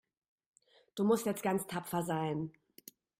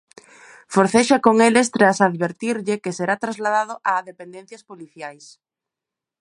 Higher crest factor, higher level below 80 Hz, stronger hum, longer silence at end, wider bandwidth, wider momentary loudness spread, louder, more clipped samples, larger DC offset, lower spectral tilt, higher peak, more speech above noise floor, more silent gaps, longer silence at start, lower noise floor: about the same, 18 dB vs 20 dB; second, -74 dBFS vs -66 dBFS; neither; second, 0.7 s vs 1.05 s; first, 16 kHz vs 11.5 kHz; about the same, 23 LU vs 21 LU; second, -35 LUFS vs -18 LUFS; neither; neither; about the same, -5.5 dB/octave vs -4.5 dB/octave; second, -18 dBFS vs 0 dBFS; second, 25 dB vs 67 dB; neither; first, 0.95 s vs 0.7 s; second, -59 dBFS vs -87 dBFS